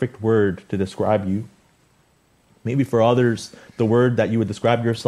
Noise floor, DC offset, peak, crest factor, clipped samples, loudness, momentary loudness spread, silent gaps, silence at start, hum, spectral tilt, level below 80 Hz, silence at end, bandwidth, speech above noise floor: -60 dBFS; under 0.1%; -2 dBFS; 18 dB; under 0.1%; -20 LUFS; 11 LU; none; 0 s; none; -7 dB/octave; -58 dBFS; 0 s; 12.5 kHz; 40 dB